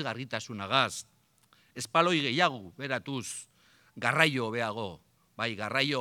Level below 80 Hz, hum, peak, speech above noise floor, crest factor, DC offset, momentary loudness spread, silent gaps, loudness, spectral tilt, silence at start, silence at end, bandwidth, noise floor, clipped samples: -76 dBFS; none; -6 dBFS; 35 dB; 26 dB; under 0.1%; 15 LU; none; -29 LUFS; -4 dB/octave; 0 s; 0 s; 19 kHz; -66 dBFS; under 0.1%